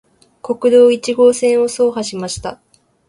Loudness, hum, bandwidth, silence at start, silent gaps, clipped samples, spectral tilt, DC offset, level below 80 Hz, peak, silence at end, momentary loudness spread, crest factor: -14 LUFS; none; 11.5 kHz; 0.45 s; none; under 0.1%; -4 dB/octave; under 0.1%; -50 dBFS; 0 dBFS; 0.55 s; 15 LU; 14 dB